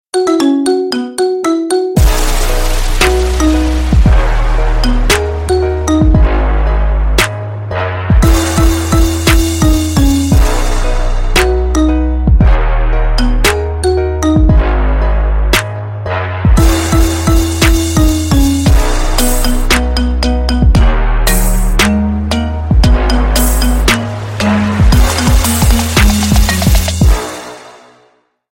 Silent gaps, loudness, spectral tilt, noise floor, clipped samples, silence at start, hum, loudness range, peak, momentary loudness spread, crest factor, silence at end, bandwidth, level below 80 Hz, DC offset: none; -12 LUFS; -5 dB/octave; -52 dBFS; under 0.1%; 0.15 s; none; 2 LU; 0 dBFS; 5 LU; 10 dB; 0.8 s; 17 kHz; -12 dBFS; under 0.1%